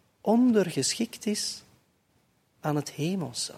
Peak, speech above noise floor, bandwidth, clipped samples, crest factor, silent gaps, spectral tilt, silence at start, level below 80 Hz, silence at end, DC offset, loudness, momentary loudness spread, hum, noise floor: -12 dBFS; 42 dB; 15 kHz; under 0.1%; 18 dB; none; -4.5 dB/octave; 0.25 s; -72 dBFS; 0 s; under 0.1%; -27 LUFS; 10 LU; none; -69 dBFS